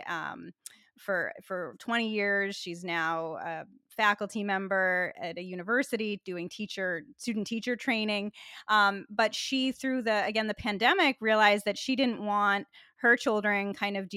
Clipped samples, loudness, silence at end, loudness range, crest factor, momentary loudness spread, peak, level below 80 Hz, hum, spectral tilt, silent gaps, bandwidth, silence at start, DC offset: under 0.1%; -29 LUFS; 0 s; 6 LU; 20 dB; 13 LU; -10 dBFS; -70 dBFS; none; -4 dB/octave; none; 15.5 kHz; 0 s; under 0.1%